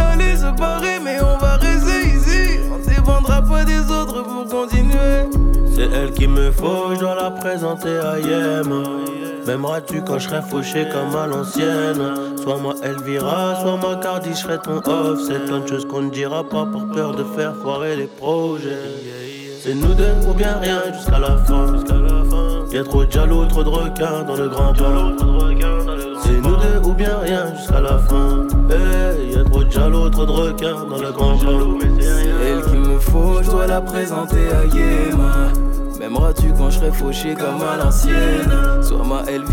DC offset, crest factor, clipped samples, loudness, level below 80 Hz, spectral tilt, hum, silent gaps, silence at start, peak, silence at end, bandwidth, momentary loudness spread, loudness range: under 0.1%; 10 dB; under 0.1%; -19 LUFS; -16 dBFS; -6 dB/octave; none; none; 0 s; -4 dBFS; 0 s; 16.5 kHz; 6 LU; 4 LU